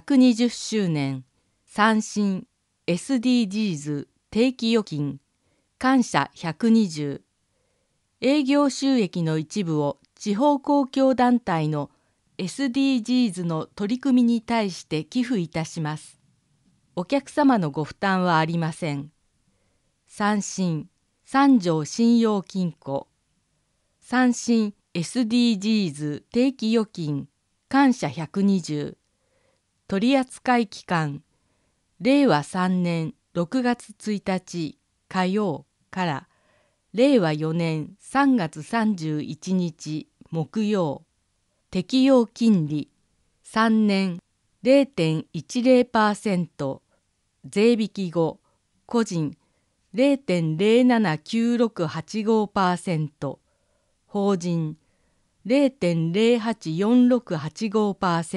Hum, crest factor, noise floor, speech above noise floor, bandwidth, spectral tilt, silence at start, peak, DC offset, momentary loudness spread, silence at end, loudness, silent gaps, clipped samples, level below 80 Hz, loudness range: none; 20 dB; -71 dBFS; 49 dB; 11.5 kHz; -6 dB/octave; 0.05 s; -4 dBFS; under 0.1%; 12 LU; 0 s; -23 LUFS; none; under 0.1%; -64 dBFS; 4 LU